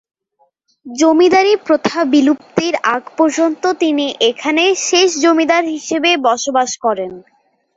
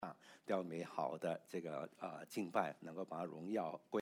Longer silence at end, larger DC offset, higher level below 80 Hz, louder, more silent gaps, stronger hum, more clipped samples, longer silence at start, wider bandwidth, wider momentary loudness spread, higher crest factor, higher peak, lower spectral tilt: first, 0.55 s vs 0 s; neither; first, -60 dBFS vs under -90 dBFS; first, -14 LUFS vs -44 LUFS; neither; neither; neither; first, 0.85 s vs 0 s; second, 8 kHz vs 18.5 kHz; about the same, 7 LU vs 8 LU; second, 14 dB vs 22 dB; first, 0 dBFS vs -22 dBFS; second, -2.5 dB/octave vs -6 dB/octave